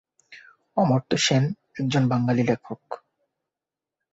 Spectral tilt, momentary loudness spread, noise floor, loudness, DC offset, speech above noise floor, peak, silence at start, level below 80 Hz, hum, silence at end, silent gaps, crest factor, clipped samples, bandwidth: -5.5 dB/octave; 16 LU; -89 dBFS; -23 LUFS; under 0.1%; 66 dB; -8 dBFS; 0.3 s; -60 dBFS; none; 1.15 s; none; 18 dB; under 0.1%; 8 kHz